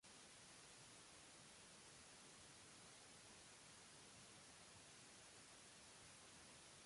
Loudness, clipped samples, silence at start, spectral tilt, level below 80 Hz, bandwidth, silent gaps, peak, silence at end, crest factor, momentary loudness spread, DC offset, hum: -62 LUFS; under 0.1%; 0 s; -1.5 dB/octave; -84 dBFS; 11.5 kHz; none; -52 dBFS; 0 s; 14 dB; 0 LU; under 0.1%; none